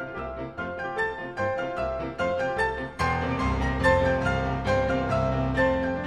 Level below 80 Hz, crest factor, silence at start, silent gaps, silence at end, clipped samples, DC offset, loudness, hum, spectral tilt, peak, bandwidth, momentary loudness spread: -38 dBFS; 18 dB; 0 s; none; 0 s; under 0.1%; under 0.1%; -26 LUFS; none; -6.5 dB/octave; -8 dBFS; 11.5 kHz; 9 LU